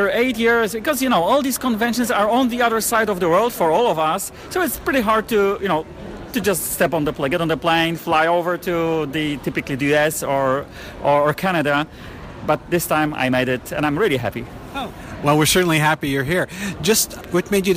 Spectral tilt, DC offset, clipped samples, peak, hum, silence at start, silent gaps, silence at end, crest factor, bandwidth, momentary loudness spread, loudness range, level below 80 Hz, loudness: -4 dB/octave; under 0.1%; under 0.1%; -4 dBFS; none; 0 s; none; 0 s; 14 dB; 16 kHz; 8 LU; 2 LU; -44 dBFS; -19 LUFS